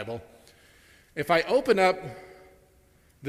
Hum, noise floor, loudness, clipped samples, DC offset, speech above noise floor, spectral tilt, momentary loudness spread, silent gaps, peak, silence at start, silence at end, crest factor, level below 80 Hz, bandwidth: none; -60 dBFS; -25 LUFS; under 0.1%; under 0.1%; 35 dB; -5 dB/octave; 19 LU; none; -8 dBFS; 0 s; 0 s; 22 dB; -60 dBFS; 15.5 kHz